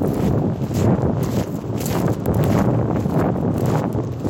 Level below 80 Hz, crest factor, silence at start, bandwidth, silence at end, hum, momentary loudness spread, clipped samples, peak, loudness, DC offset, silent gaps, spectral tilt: -36 dBFS; 14 dB; 0 s; 17 kHz; 0 s; none; 5 LU; under 0.1%; -6 dBFS; -20 LUFS; under 0.1%; none; -8 dB/octave